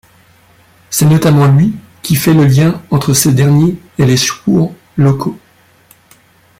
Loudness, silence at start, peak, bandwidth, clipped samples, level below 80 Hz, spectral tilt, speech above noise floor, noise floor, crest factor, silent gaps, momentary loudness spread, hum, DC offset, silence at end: -11 LUFS; 0.9 s; 0 dBFS; 16.5 kHz; under 0.1%; -44 dBFS; -5.5 dB/octave; 38 dB; -48 dBFS; 12 dB; none; 8 LU; none; under 0.1%; 1.25 s